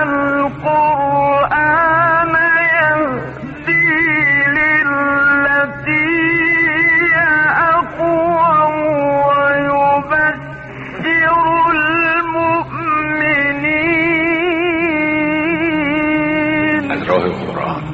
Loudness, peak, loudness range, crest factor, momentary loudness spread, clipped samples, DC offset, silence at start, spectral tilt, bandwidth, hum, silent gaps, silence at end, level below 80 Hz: -13 LUFS; -2 dBFS; 3 LU; 12 dB; 6 LU; under 0.1%; under 0.1%; 0 s; -7.5 dB/octave; 6.6 kHz; none; none; 0 s; -44 dBFS